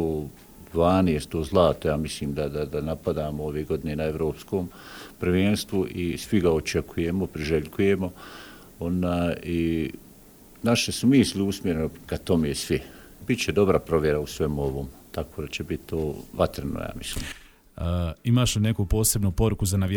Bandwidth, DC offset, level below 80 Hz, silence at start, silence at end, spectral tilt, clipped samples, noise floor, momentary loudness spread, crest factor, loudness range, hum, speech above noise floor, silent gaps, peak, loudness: over 20 kHz; under 0.1%; -40 dBFS; 0 s; 0 s; -5.5 dB/octave; under 0.1%; -50 dBFS; 12 LU; 20 dB; 4 LU; none; 25 dB; none; -6 dBFS; -26 LUFS